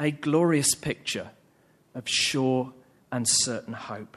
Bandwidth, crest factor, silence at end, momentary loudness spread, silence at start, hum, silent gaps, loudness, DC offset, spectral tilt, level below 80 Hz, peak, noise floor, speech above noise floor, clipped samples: 14 kHz; 18 dB; 0.1 s; 15 LU; 0 s; none; none; -25 LUFS; under 0.1%; -3 dB/octave; -62 dBFS; -10 dBFS; -62 dBFS; 36 dB; under 0.1%